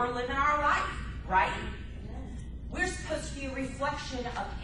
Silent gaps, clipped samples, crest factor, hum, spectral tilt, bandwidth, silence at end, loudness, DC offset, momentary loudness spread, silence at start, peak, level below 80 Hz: none; under 0.1%; 20 dB; none; -4.5 dB/octave; 11.5 kHz; 0 s; -31 LUFS; under 0.1%; 15 LU; 0 s; -14 dBFS; -42 dBFS